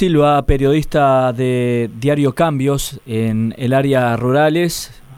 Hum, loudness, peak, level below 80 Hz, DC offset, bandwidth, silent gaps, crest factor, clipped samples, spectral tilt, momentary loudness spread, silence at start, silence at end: none; -16 LUFS; -2 dBFS; -30 dBFS; under 0.1%; 16.5 kHz; none; 14 dB; under 0.1%; -6.5 dB/octave; 6 LU; 0 s; 0 s